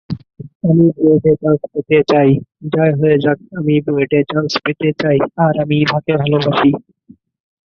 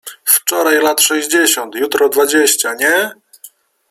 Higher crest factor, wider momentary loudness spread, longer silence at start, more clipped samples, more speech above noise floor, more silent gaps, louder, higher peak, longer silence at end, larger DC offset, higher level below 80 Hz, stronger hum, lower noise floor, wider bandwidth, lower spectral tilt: about the same, 14 dB vs 14 dB; about the same, 7 LU vs 5 LU; about the same, 0.1 s vs 0.05 s; neither; first, 33 dB vs 29 dB; first, 0.55-0.60 s vs none; about the same, -14 LUFS vs -12 LUFS; about the same, 0 dBFS vs 0 dBFS; first, 1 s vs 0.45 s; neither; first, -50 dBFS vs -64 dBFS; neither; first, -46 dBFS vs -42 dBFS; second, 6.8 kHz vs 19.5 kHz; first, -8 dB/octave vs 0 dB/octave